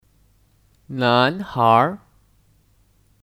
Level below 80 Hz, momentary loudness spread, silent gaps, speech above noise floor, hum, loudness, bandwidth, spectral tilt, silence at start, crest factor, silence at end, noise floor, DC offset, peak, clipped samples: -58 dBFS; 15 LU; none; 41 dB; none; -18 LUFS; 16 kHz; -7 dB/octave; 0.9 s; 20 dB; 1.3 s; -59 dBFS; under 0.1%; -2 dBFS; under 0.1%